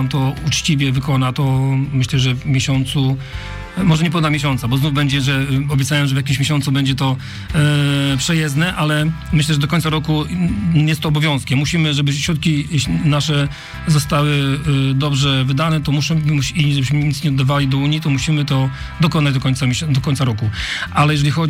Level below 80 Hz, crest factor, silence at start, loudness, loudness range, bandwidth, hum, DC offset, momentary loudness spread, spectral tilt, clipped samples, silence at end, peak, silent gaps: -36 dBFS; 12 dB; 0 s; -17 LUFS; 1 LU; 15.5 kHz; none; under 0.1%; 3 LU; -5.5 dB/octave; under 0.1%; 0 s; -4 dBFS; none